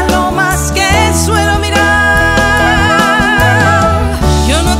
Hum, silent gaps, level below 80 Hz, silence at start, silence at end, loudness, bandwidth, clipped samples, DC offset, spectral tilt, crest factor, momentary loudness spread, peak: none; none; -18 dBFS; 0 s; 0 s; -9 LUFS; 16.5 kHz; under 0.1%; under 0.1%; -4 dB/octave; 10 dB; 3 LU; 0 dBFS